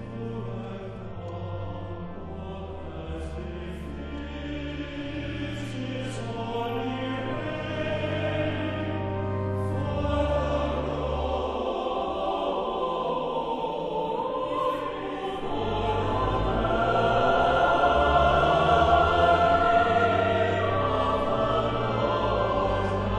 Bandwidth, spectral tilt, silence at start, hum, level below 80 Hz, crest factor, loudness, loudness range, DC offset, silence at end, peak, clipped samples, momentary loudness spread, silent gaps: 10.5 kHz; -7 dB/octave; 0 s; none; -40 dBFS; 18 dB; -26 LUFS; 14 LU; under 0.1%; 0 s; -8 dBFS; under 0.1%; 15 LU; none